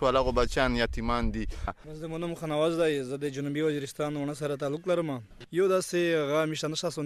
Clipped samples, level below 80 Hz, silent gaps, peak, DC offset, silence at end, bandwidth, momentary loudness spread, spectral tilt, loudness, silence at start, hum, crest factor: under 0.1%; -40 dBFS; none; -10 dBFS; under 0.1%; 0 s; 15 kHz; 9 LU; -5 dB/octave; -29 LUFS; 0 s; none; 18 dB